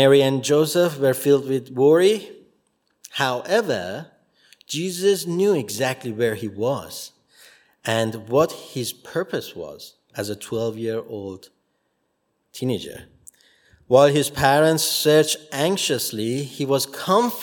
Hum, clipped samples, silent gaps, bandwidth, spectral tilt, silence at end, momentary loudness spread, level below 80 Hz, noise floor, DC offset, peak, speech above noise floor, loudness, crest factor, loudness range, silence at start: none; under 0.1%; none; 18 kHz; -4.5 dB/octave; 0 s; 17 LU; -60 dBFS; -71 dBFS; under 0.1%; -2 dBFS; 51 dB; -21 LUFS; 20 dB; 11 LU; 0 s